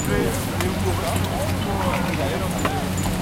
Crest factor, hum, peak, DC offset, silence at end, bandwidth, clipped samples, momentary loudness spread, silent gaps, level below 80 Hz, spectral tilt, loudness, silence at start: 18 dB; none; -4 dBFS; under 0.1%; 0 s; 17 kHz; under 0.1%; 2 LU; none; -34 dBFS; -5 dB/octave; -23 LUFS; 0 s